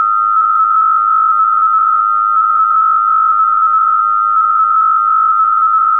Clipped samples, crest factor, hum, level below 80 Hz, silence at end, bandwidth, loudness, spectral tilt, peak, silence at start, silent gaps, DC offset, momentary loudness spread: under 0.1%; 6 dB; none; -64 dBFS; 0 s; 3.5 kHz; -10 LUFS; -5.5 dB/octave; -6 dBFS; 0 s; none; 0.4%; 1 LU